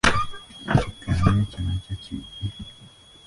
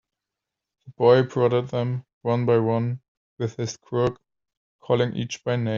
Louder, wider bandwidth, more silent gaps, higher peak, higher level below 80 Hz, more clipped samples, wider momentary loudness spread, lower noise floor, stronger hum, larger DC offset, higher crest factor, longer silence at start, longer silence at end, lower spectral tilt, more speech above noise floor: about the same, -26 LUFS vs -24 LUFS; first, 11.5 kHz vs 7.4 kHz; second, none vs 2.13-2.21 s, 3.08-3.37 s, 4.57-4.79 s; about the same, -4 dBFS vs -4 dBFS; first, -36 dBFS vs -60 dBFS; neither; first, 15 LU vs 12 LU; second, -49 dBFS vs -86 dBFS; neither; neither; about the same, 22 dB vs 20 dB; second, 0.05 s vs 0.85 s; first, 0.4 s vs 0 s; about the same, -5.5 dB/octave vs -6.5 dB/octave; second, 21 dB vs 64 dB